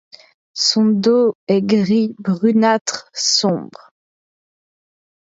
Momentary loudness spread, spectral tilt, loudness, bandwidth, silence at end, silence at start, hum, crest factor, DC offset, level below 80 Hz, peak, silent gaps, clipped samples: 6 LU; -4 dB/octave; -16 LUFS; 8 kHz; 1.65 s; 0.55 s; none; 16 dB; under 0.1%; -66 dBFS; -2 dBFS; 1.35-1.47 s, 2.81-2.85 s; under 0.1%